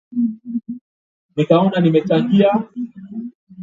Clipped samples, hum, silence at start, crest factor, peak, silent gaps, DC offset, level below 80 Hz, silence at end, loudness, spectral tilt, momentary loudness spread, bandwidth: under 0.1%; none; 0.1 s; 18 dB; 0 dBFS; 0.81-1.29 s, 3.35-3.47 s; under 0.1%; -62 dBFS; 0 s; -17 LUFS; -9 dB/octave; 17 LU; 7.4 kHz